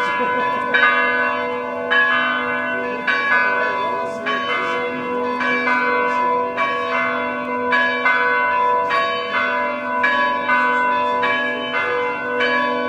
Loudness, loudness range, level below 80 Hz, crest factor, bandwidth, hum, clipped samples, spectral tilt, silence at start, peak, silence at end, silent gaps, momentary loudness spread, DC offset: -18 LUFS; 2 LU; -60 dBFS; 16 dB; 9.8 kHz; none; under 0.1%; -4 dB/octave; 0 s; -2 dBFS; 0 s; none; 6 LU; under 0.1%